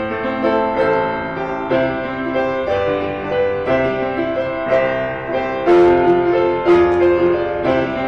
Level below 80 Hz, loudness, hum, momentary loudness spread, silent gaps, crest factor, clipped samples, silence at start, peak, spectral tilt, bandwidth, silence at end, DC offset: -42 dBFS; -17 LUFS; none; 8 LU; none; 10 dB; under 0.1%; 0 s; -6 dBFS; -7.5 dB/octave; 6.4 kHz; 0 s; 0.3%